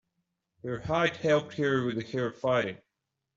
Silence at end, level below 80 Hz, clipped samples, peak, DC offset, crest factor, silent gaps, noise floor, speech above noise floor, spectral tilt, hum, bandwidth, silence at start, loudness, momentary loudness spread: 0.6 s; -62 dBFS; under 0.1%; -12 dBFS; under 0.1%; 18 dB; none; -84 dBFS; 56 dB; -6 dB/octave; none; 7.8 kHz; 0.65 s; -29 LUFS; 11 LU